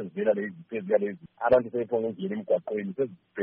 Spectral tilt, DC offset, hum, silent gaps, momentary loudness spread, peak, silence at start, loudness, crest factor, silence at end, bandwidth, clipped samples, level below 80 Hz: -6 dB/octave; under 0.1%; none; none; 10 LU; -10 dBFS; 0 s; -28 LUFS; 18 dB; 0 s; 4.6 kHz; under 0.1%; -64 dBFS